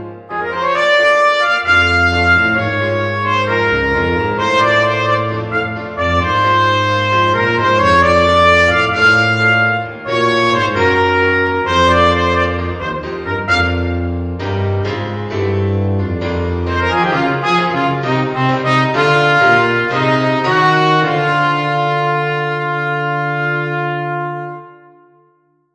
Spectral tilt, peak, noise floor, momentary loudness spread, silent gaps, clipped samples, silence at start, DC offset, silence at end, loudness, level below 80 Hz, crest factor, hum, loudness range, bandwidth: -5.5 dB/octave; 0 dBFS; -57 dBFS; 9 LU; none; under 0.1%; 0 s; under 0.1%; 1.05 s; -14 LUFS; -38 dBFS; 14 dB; none; 6 LU; 10 kHz